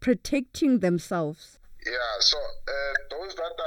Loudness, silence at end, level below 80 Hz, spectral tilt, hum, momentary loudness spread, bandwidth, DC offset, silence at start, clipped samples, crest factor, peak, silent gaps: -26 LUFS; 0 s; -48 dBFS; -4 dB/octave; none; 12 LU; 17.5 kHz; under 0.1%; 0 s; under 0.1%; 20 dB; -8 dBFS; none